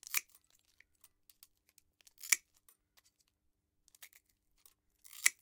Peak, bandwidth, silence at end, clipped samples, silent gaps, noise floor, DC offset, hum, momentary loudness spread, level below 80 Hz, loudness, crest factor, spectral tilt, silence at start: -8 dBFS; 18 kHz; 0.1 s; under 0.1%; none; -82 dBFS; under 0.1%; 50 Hz at -95 dBFS; 25 LU; -84 dBFS; -35 LUFS; 36 dB; 4.5 dB/octave; 0.1 s